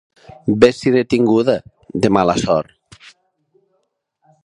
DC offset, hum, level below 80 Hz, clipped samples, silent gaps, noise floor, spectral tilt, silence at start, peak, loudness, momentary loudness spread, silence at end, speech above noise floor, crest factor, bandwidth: under 0.1%; none; -48 dBFS; under 0.1%; none; -68 dBFS; -6 dB/octave; 0.45 s; 0 dBFS; -16 LUFS; 11 LU; 1.85 s; 54 dB; 18 dB; 11 kHz